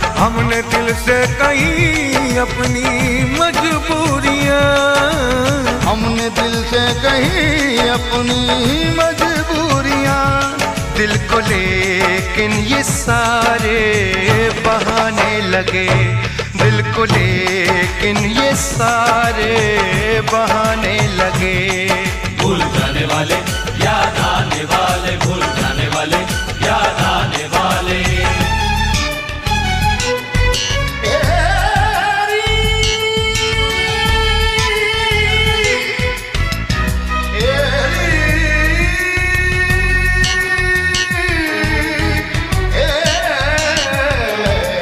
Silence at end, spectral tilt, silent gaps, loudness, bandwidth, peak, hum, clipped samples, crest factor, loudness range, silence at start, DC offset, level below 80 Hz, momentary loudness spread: 0 s; -4 dB/octave; none; -14 LUFS; 16 kHz; 0 dBFS; none; under 0.1%; 14 dB; 2 LU; 0 s; under 0.1%; -24 dBFS; 4 LU